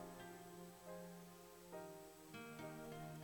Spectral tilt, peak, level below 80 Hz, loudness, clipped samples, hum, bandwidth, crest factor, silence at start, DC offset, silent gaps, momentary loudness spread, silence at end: -5 dB/octave; -40 dBFS; -76 dBFS; -56 LUFS; under 0.1%; none; 19 kHz; 16 dB; 0 s; under 0.1%; none; 6 LU; 0 s